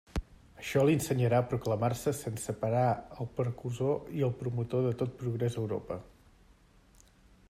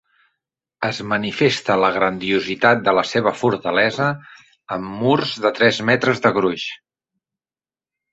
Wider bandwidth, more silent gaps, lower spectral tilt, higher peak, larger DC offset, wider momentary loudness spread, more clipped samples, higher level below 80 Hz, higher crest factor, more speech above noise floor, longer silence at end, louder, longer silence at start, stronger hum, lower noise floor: first, 15.5 kHz vs 8.2 kHz; neither; first, -6.5 dB/octave vs -5 dB/octave; second, -14 dBFS vs -2 dBFS; neither; about the same, 10 LU vs 11 LU; neither; about the same, -54 dBFS vs -58 dBFS; about the same, 18 dB vs 18 dB; second, 30 dB vs over 72 dB; about the same, 1.45 s vs 1.35 s; second, -32 LUFS vs -18 LUFS; second, 0.15 s vs 0.8 s; neither; second, -61 dBFS vs under -90 dBFS